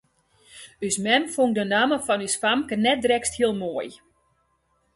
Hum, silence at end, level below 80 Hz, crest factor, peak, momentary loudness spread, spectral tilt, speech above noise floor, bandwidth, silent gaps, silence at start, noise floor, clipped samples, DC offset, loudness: none; 1 s; -60 dBFS; 20 dB; -6 dBFS; 11 LU; -3 dB/octave; 46 dB; 12 kHz; none; 0.55 s; -69 dBFS; under 0.1%; under 0.1%; -23 LUFS